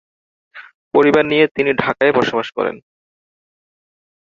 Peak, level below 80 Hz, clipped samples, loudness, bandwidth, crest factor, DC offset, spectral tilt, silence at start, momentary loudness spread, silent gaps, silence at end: -2 dBFS; -56 dBFS; under 0.1%; -16 LUFS; 7.4 kHz; 18 dB; under 0.1%; -6 dB/octave; 0.55 s; 9 LU; 0.75-0.91 s, 1.51-1.55 s; 1.55 s